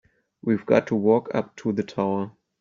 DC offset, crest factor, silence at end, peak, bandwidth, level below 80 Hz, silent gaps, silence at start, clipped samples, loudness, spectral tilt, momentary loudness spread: under 0.1%; 20 dB; 0.3 s; -6 dBFS; 7.4 kHz; -64 dBFS; none; 0.45 s; under 0.1%; -24 LUFS; -7 dB/octave; 9 LU